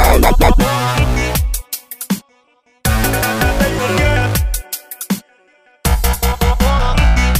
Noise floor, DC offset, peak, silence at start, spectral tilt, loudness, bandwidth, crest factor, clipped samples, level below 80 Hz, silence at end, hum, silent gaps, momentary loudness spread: -55 dBFS; under 0.1%; 0 dBFS; 0 s; -4.5 dB/octave; -16 LUFS; 16 kHz; 14 dB; under 0.1%; -16 dBFS; 0 s; none; none; 10 LU